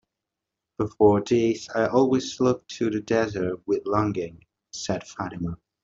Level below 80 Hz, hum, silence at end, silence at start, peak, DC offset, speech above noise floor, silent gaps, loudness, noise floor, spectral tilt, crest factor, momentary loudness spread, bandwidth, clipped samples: -56 dBFS; none; 0.3 s; 0.8 s; -4 dBFS; under 0.1%; 62 dB; none; -25 LUFS; -86 dBFS; -6 dB/octave; 20 dB; 13 LU; 7.8 kHz; under 0.1%